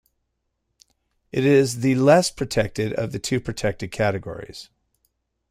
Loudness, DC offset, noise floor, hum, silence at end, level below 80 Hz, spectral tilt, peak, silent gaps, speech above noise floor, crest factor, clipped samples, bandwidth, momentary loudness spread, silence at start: -21 LUFS; under 0.1%; -76 dBFS; none; 0.85 s; -50 dBFS; -5.5 dB/octave; -4 dBFS; none; 54 dB; 20 dB; under 0.1%; 15.5 kHz; 16 LU; 1.35 s